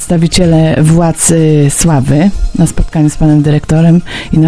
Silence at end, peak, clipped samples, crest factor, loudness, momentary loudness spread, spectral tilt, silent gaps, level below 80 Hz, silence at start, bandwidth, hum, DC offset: 0 s; 0 dBFS; 0.3%; 8 dB; -9 LUFS; 4 LU; -6 dB/octave; none; -20 dBFS; 0 s; 11 kHz; none; 3%